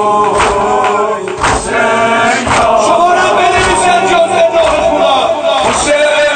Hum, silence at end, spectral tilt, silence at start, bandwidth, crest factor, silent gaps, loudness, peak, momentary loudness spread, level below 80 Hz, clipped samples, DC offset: none; 0 s; -3 dB/octave; 0 s; 9.2 kHz; 10 dB; none; -9 LUFS; 0 dBFS; 3 LU; -32 dBFS; under 0.1%; under 0.1%